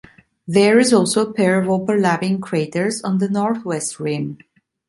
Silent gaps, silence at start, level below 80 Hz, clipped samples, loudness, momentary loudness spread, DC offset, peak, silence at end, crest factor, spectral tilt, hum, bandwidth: none; 0.45 s; -60 dBFS; under 0.1%; -18 LUFS; 10 LU; under 0.1%; -2 dBFS; 0.55 s; 16 dB; -5 dB/octave; none; 11.5 kHz